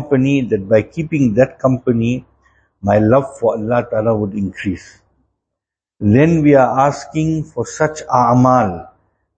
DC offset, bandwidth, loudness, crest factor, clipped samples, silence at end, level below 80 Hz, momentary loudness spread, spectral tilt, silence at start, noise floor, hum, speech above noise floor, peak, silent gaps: under 0.1%; 8.6 kHz; -15 LUFS; 16 dB; under 0.1%; 0.5 s; -44 dBFS; 10 LU; -7.5 dB/octave; 0 s; -82 dBFS; none; 68 dB; 0 dBFS; none